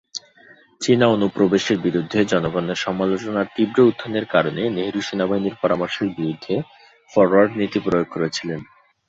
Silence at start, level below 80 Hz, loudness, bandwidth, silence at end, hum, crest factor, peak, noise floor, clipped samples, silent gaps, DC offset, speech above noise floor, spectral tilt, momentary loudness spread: 0.15 s; -56 dBFS; -20 LUFS; 8 kHz; 0.45 s; none; 18 dB; -2 dBFS; -50 dBFS; under 0.1%; none; under 0.1%; 31 dB; -5.5 dB/octave; 10 LU